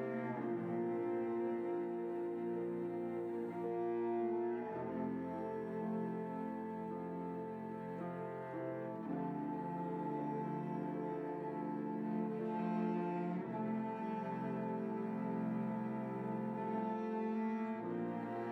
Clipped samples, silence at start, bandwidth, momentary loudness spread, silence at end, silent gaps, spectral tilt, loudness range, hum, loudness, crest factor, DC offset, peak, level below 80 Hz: under 0.1%; 0 s; 6 kHz; 5 LU; 0 s; none; -10 dB/octave; 3 LU; none; -41 LUFS; 12 dB; under 0.1%; -28 dBFS; -80 dBFS